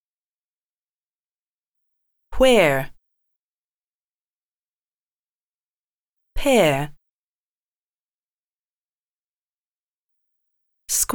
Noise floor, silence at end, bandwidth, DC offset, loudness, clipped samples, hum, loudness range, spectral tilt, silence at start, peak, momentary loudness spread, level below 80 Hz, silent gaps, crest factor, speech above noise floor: under -90 dBFS; 0 s; over 20 kHz; under 0.1%; -18 LUFS; under 0.1%; none; 5 LU; -3.5 dB/octave; 2.3 s; -4 dBFS; 14 LU; -42 dBFS; 3.36-6.16 s, 7.09-10.09 s; 22 dB; over 74 dB